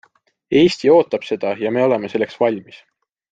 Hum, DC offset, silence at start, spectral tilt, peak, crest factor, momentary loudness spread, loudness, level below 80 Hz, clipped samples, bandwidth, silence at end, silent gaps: none; under 0.1%; 0.5 s; -6 dB/octave; -2 dBFS; 16 dB; 8 LU; -17 LUFS; -58 dBFS; under 0.1%; 9 kHz; 0.55 s; none